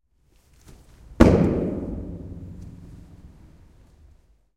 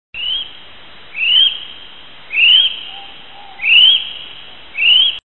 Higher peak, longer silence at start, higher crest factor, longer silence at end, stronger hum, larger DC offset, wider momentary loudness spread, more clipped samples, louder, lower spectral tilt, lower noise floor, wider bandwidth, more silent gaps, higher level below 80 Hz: about the same, -2 dBFS vs 0 dBFS; first, 1.1 s vs 0.15 s; first, 24 dB vs 16 dB; first, 1.3 s vs 0.1 s; neither; second, under 0.1% vs 1%; first, 27 LU vs 22 LU; neither; second, -21 LUFS vs -10 LUFS; first, -8 dB/octave vs -2 dB/octave; first, -61 dBFS vs -39 dBFS; first, 13 kHz vs 4.2 kHz; neither; first, -36 dBFS vs -54 dBFS